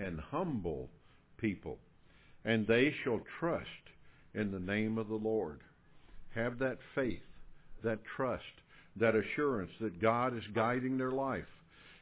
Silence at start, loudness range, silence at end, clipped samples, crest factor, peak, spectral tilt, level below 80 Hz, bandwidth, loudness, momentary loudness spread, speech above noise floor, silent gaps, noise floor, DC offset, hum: 0 s; 5 LU; 0.05 s; under 0.1%; 20 dB; -16 dBFS; -5 dB/octave; -60 dBFS; 4 kHz; -36 LUFS; 15 LU; 26 dB; none; -61 dBFS; under 0.1%; none